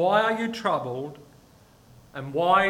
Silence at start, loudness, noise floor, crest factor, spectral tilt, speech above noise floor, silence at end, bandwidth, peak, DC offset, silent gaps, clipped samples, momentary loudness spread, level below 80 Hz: 0 s; -26 LUFS; -55 dBFS; 20 dB; -5.5 dB/octave; 31 dB; 0 s; 16.5 kHz; -6 dBFS; under 0.1%; none; under 0.1%; 17 LU; -60 dBFS